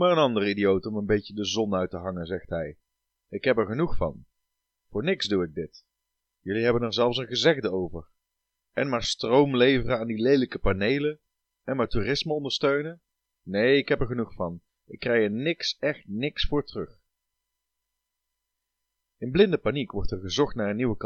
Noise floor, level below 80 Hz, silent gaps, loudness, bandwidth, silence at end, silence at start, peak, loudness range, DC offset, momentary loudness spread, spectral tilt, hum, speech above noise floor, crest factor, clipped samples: -83 dBFS; -44 dBFS; none; -26 LUFS; 8.8 kHz; 0 s; 0 s; -6 dBFS; 6 LU; under 0.1%; 13 LU; -5.5 dB/octave; none; 57 dB; 20 dB; under 0.1%